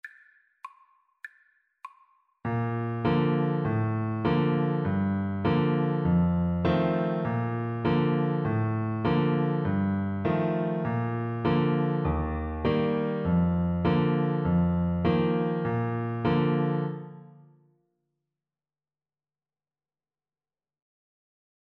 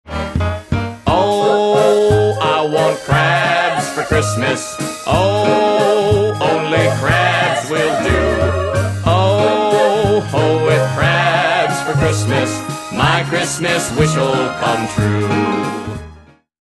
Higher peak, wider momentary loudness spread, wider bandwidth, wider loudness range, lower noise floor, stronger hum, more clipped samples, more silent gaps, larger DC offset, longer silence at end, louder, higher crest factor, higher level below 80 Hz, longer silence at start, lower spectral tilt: second, -12 dBFS vs 0 dBFS; about the same, 5 LU vs 7 LU; second, 4.9 kHz vs 12.5 kHz; first, 5 LU vs 2 LU; first, under -90 dBFS vs -42 dBFS; neither; neither; neither; neither; first, 4.45 s vs 0.45 s; second, -27 LUFS vs -15 LUFS; about the same, 16 dB vs 14 dB; second, -46 dBFS vs -34 dBFS; about the same, 0.05 s vs 0.05 s; first, -10.5 dB/octave vs -5 dB/octave